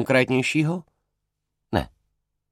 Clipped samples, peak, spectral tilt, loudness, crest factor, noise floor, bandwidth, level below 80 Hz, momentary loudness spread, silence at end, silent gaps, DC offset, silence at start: under 0.1%; -4 dBFS; -5.5 dB/octave; -23 LUFS; 22 dB; -79 dBFS; 16 kHz; -48 dBFS; 13 LU; 0.65 s; none; under 0.1%; 0 s